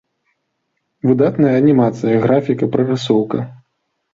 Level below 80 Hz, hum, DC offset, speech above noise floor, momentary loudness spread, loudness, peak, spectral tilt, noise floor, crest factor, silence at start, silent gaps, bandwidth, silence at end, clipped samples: -56 dBFS; none; under 0.1%; 57 dB; 9 LU; -15 LUFS; -2 dBFS; -8 dB/octave; -71 dBFS; 14 dB; 1.05 s; none; 7.6 kHz; 0.6 s; under 0.1%